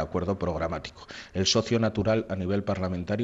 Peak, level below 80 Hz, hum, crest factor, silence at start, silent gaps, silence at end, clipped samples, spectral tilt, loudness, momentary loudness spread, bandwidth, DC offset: -12 dBFS; -50 dBFS; none; 16 dB; 0 s; none; 0 s; under 0.1%; -5 dB/octave; -28 LUFS; 12 LU; 8 kHz; under 0.1%